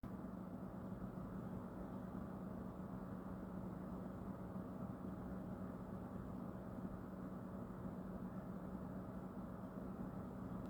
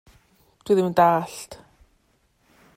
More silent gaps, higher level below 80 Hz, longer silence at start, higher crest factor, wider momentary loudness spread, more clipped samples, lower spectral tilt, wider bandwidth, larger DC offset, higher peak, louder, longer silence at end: neither; about the same, -62 dBFS vs -60 dBFS; second, 0.05 s vs 0.65 s; second, 14 dB vs 20 dB; second, 1 LU vs 23 LU; neither; first, -9.5 dB/octave vs -6 dB/octave; first, over 20 kHz vs 16 kHz; neither; second, -34 dBFS vs -4 dBFS; second, -50 LUFS vs -20 LUFS; second, 0 s vs 1.2 s